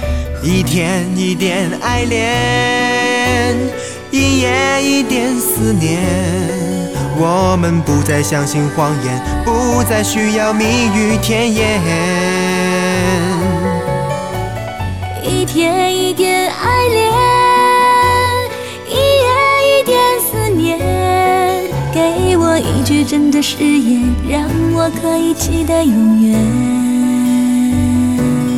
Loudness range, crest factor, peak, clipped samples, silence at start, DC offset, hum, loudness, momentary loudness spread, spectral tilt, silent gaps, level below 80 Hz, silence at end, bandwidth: 3 LU; 12 dB; -2 dBFS; under 0.1%; 0 s; 0.7%; none; -13 LUFS; 7 LU; -5 dB/octave; none; -30 dBFS; 0 s; 17.5 kHz